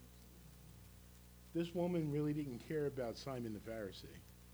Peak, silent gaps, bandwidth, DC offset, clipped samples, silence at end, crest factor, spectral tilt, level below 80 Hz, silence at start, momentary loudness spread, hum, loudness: -28 dBFS; none; over 20 kHz; under 0.1%; under 0.1%; 0 s; 16 dB; -7 dB/octave; -64 dBFS; 0 s; 21 LU; 60 Hz at -60 dBFS; -42 LUFS